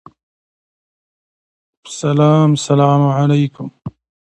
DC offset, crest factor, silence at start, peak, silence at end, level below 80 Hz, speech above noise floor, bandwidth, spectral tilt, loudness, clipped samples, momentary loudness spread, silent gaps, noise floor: under 0.1%; 16 dB; 1.85 s; 0 dBFS; 0.45 s; -58 dBFS; over 77 dB; 9.2 kHz; -7 dB/octave; -14 LUFS; under 0.1%; 19 LU; none; under -90 dBFS